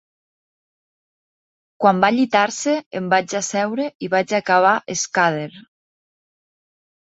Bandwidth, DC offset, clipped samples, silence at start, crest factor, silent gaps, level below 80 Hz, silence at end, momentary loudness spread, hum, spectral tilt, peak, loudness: 8.2 kHz; under 0.1%; under 0.1%; 1.8 s; 20 dB; 2.86-2.91 s, 3.95-4.00 s; -68 dBFS; 1.45 s; 8 LU; none; -4 dB/octave; 0 dBFS; -19 LUFS